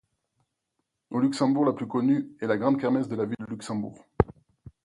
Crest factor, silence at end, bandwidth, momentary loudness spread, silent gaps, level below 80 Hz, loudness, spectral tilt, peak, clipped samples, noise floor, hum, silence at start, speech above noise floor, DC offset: 24 dB; 0.15 s; 11 kHz; 10 LU; none; -50 dBFS; -27 LUFS; -7 dB/octave; -4 dBFS; under 0.1%; -80 dBFS; none; 1.1 s; 54 dB; under 0.1%